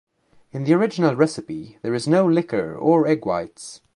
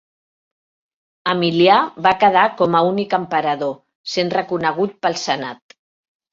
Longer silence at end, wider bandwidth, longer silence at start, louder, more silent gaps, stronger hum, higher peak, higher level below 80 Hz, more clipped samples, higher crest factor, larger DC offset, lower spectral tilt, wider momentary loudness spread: second, 0.2 s vs 0.8 s; first, 11 kHz vs 7.8 kHz; second, 0.55 s vs 1.25 s; second, -20 LUFS vs -17 LUFS; second, none vs 3.95-4.04 s; neither; about the same, -2 dBFS vs 0 dBFS; about the same, -60 dBFS vs -62 dBFS; neither; about the same, 18 dB vs 18 dB; neither; first, -7 dB/octave vs -5 dB/octave; first, 15 LU vs 11 LU